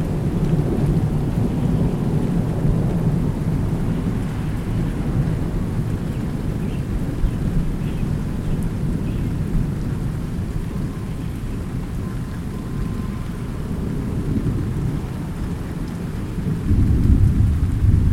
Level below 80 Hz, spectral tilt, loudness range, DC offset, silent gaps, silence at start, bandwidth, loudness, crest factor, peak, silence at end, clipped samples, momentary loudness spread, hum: -26 dBFS; -8.5 dB/octave; 6 LU; under 0.1%; none; 0 s; 16 kHz; -23 LUFS; 18 dB; -2 dBFS; 0 s; under 0.1%; 8 LU; none